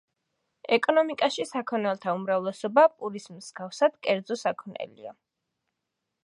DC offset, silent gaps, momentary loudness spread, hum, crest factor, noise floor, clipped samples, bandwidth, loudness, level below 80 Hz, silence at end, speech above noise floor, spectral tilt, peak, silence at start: under 0.1%; none; 18 LU; none; 22 dB; -83 dBFS; under 0.1%; 11.5 kHz; -26 LUFS; -82 dBFS; 1.15 s; 57 dB; -4.5 dB/octave; -6 dBFS; 0.7 s